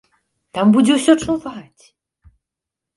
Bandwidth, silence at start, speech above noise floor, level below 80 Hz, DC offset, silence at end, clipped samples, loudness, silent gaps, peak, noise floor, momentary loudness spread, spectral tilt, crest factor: 11.5 kHz; 0.55 s; 69 dB; -52 dBFS; under 0.1%; 1.35 s; under 0.1%; -15 LUFS; none; 0 dBFS; -85 dBFS; 19 LU; -5 dB/octave; 18 dB